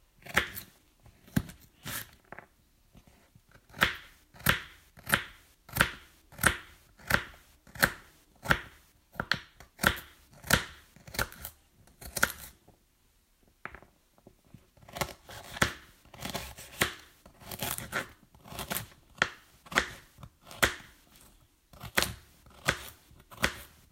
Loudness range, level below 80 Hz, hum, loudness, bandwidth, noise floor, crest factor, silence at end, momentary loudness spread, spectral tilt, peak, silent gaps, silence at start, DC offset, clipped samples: 7 LU; -52 dBFS; none; -32 LUFS; 16.5 kHz; -68 dBFS; 30 dB; 0.25 s; 21 LU; -2.5 dB/octave; -6 dBFS; none; 0.25 s; under 0.1%; under 0.1%